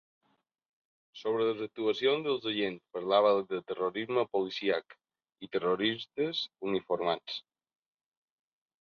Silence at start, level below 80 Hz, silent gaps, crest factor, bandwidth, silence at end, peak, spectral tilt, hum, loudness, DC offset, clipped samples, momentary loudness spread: 1.15 s; -76 dBFS; none; 20 dB; 6.8 kHz; 1.4 s; -12 dBFS; -6 dB/octave; none; -32 LUFS; under 0.1%; under 0.1%; 9 LU